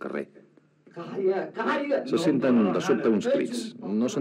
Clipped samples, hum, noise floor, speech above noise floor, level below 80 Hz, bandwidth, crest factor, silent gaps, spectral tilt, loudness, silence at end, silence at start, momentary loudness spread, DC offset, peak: under 0.1%; none; -57 dBFS; 32 dB; -82 dBFS; 12.5 kHz; 16 dB; none; -6 dB/octave; -26 LUFS; 0 s; 0 s; 13 LU; under 0.1%; -10 dBFS